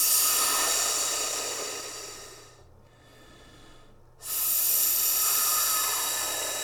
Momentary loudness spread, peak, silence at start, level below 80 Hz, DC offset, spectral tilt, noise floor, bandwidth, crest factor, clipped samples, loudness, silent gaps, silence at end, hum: 16 LU; -10 dBFS; 0 s; -58 dBFS; under 0.1%; 1.5 dB/octave; -54 dBFS; 19 kHz; 18 dB; under 0.1%; -24 LUFS; none; 0 s; none